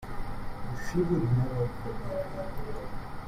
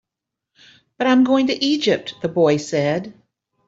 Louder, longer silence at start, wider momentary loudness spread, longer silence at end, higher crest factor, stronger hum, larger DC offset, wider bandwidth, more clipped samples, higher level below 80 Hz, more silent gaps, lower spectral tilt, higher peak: second, -33 LUFS vs -18 LUFS; second, 0 s vs 1 s; first, 13 LU vs 9 LU; second, 0 s vs 0.55 s; about the same, 16 dB vs 16 dB; neither; neither; first, 14.5 kHz vs 7.8 kHz; neither; first, -40 dBFS vs -64 dBFS; neither; first, -8 dB/octave vs -5.5 dB/octave; second, -16 dBFS vs -4 dBFS